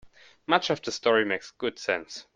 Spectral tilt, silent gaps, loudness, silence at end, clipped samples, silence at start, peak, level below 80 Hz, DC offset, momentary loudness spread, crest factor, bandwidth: -3.5 dB/octave; none; -27 LUFS; 0.15 s; under 0.1%; 0.05 s; -6 dBFS; -68 dBFS; under 0.1%; 8 LU; 22 dB; 9.4 kHz